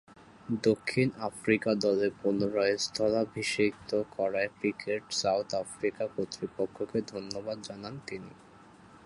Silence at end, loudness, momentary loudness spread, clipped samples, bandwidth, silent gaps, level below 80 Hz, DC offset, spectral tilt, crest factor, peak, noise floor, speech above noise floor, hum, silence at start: 0.2 s; -31 LUFS; 11 LU; under 0.1%; 11.5 kHz; none; -66 dBFS; under 0.1%; -4.5 dB/octave; 20 dB; -12 dBFS; -55 dBFS; 24 dB; none; 0.1 s